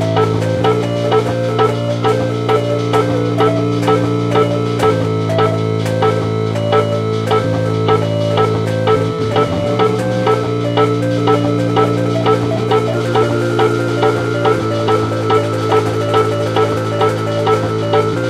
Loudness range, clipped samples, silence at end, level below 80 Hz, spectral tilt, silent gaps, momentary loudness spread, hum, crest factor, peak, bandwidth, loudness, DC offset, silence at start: 1 LU; under 0.1%; 0 s; -46 dBFS; -7 dB/octave; none; 2 LU; none; 14 dB; 0 dBFS; 13 kHz; -15 LUFS; under 0.1%; 0 s